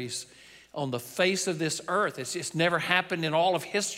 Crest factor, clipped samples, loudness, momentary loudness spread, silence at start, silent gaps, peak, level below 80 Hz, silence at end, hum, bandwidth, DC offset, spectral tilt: 20 dB; under 0.1%; -28 LUFS; 10 LU; 0 s; none; -8 dBFS; -72 dBFS; 0 s; none; 16 kHz; under 0.1%; -3.5 dB/octave